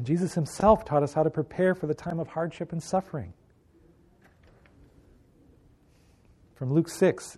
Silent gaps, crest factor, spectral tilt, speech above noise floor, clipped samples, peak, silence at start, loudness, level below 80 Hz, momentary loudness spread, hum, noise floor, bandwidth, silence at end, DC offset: none; 22 dB; -7 dB/octave; 34 dB; under 0.1%; -6 dBFS; 0 s; -27 LUFS; -54 dBFS; 13 LU; none; -60 dBFS; 13.5 kHz; 0.05 s; under 0.1%